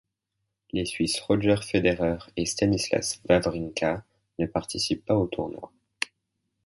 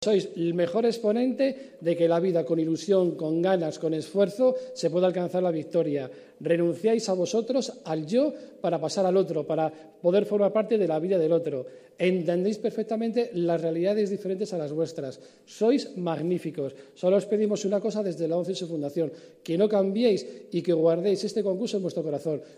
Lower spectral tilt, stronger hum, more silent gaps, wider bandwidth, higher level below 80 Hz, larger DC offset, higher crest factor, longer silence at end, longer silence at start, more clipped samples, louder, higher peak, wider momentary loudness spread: second, -4.5 dB/octave vs -6.5 dB/octave; neither; neither; about the same, 11.5 kHz vs 12 kHz; first, -50 dBFS vs -80 dBFS; neither; first, 22 dB vs 16 dB; first, 0.6 s vs 0.05 s; first, 0.75 s vs 0 s; neither; about the same, -27 LUFS vs -26 LUFS; first, -6 dBFS vs -10 dBFS; about the same, 10 LU vs 8 LU